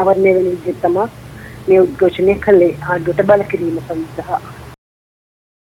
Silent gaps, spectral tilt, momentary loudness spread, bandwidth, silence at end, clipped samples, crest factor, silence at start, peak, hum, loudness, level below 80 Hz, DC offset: none; -8 dB/octave; 13 LU; 13.5 kHz; 1 s; under 0.1%; 16 dB; 0 s; 0 dBFS; none; -15 LUFS; -44 dBFS; under 0.1%